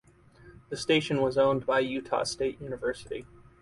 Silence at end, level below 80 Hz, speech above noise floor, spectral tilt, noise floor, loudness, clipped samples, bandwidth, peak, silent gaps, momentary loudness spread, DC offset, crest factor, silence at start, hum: 0.4 s; -58 dBFS; 27 dB; -4.5 dB/octave; -55 dBFS; -28 LUFS; under 0.1%; 11.5 kHz; -12 dBFS; none; 14 LU; under 0.1%; 18 dB; 0.45 s; none